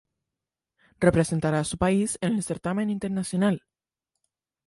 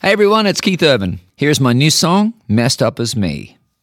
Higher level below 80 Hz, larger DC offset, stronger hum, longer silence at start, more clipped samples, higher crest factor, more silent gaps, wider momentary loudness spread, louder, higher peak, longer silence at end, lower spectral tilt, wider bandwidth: about the same, -50 dBFS vs -46 dBFS; neither; neither; first, 1 s vs 0.05 s; neither; first, 22 dB vs 14 dB; neither; about the same, 6 LU vs 8 LU; second, -26 LUFS vs -14 LUFS; second, -4 dBFS vs 0 dBFS; first, 1.1 s vs 0.35 s; first, -6 dB/octave vs -4.5 dB/octave; second, 11.5 kHz vs 17.5 kHz